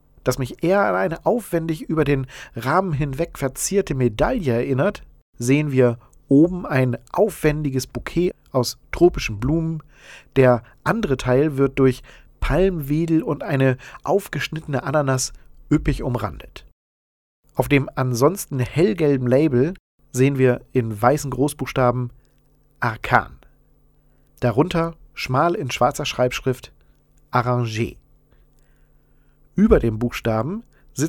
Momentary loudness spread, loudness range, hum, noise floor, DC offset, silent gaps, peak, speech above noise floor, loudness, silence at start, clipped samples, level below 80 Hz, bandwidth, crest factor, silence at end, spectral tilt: 10 LU; 4 LU; none; -57 dBFS; under 0.1%; 5.22-5.33 s, 16.73-17.43 s, 19.80-19.98 s; 0 dBFS; 38 dB; -21 LUFS; 0.25 s; under 0.1%; -38 dBFS; 18 kHz; 20 dB; 0 s; -6 dB/octave